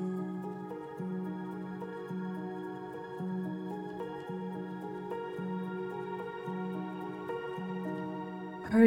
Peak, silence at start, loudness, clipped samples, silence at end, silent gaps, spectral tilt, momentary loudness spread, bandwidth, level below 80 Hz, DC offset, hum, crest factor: -12 dBFS; 0 s; -39 LUFS; under 0.1%; 0 s; none; -8.5 dB/octave; 4 LU; 11.5 kHz; -70 dBFS; under 0.1%; none; 24 dB